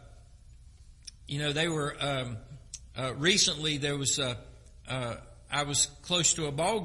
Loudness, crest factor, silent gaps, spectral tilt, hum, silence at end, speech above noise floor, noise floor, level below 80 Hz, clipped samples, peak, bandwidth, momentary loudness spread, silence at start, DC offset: -29 LUFS; 22 dB; none; -2.5 dB/octave; none; 0 s; 23 dB; -53 dBFS; -54 dBFS; under 0.1%; -10 dBFS; 11.5 kHz; 20 LU; 0 s; under 0.1%